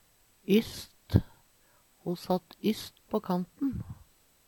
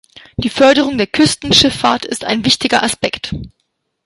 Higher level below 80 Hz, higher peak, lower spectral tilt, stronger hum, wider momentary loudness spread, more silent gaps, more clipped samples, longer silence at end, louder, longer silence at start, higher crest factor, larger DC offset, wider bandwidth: second, -50 dBFS vs -40 dBFS; second, -6 dBFS vs 0 dBFS; first, -7 dB/octave vs -3.5 dB/octave; neither; first, 16 LU vs 13 LU; neither; neither; about the same, 0.55 s vs 0.55 s; second, -32 LUFS vs -13 LUFS; about the same, 0.5 s vs 0.4 s; first, 26 dB vs 14 dB; neither; first, 19 kHz vs 12 kHz